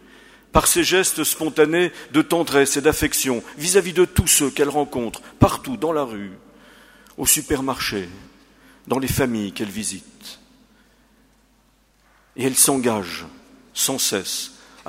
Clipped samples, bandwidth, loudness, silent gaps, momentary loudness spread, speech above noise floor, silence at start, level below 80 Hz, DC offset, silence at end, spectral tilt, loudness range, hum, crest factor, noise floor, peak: under 0.1%; 16 kHz; -19 LUFS; none; 16 LU; 39 dB; 0.55 s; -40 dBFS; under 0.1%; 0.4 s; -3 dB/octave; 9 LU; none; 22 dB; -59 dBFS; 0 dBFS